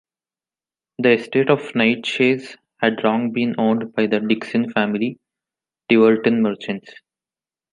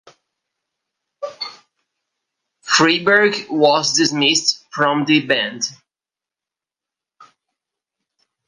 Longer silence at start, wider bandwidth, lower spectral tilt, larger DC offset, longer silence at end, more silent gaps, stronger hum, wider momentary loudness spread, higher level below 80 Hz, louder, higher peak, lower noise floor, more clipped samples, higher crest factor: second, 1 s vs 1.2 s; about the same, 10 kHz vs 11 kHz; first, -6.5 dB/octave vs -2.5 dB/octave; neither; second, 0.85 s vs 2.75 s; neither; neither; second, 9 LU vs 17 LU; about the same, -68 dBFS vs -70 dBFS; second, -19 LUFS vs -15 LUFS; about the same, 0 dBFS vs 0 dBFS; about the same, under -90 dBFS vs -89 dBFS; neither; about the same, 20 dB vs 20 dB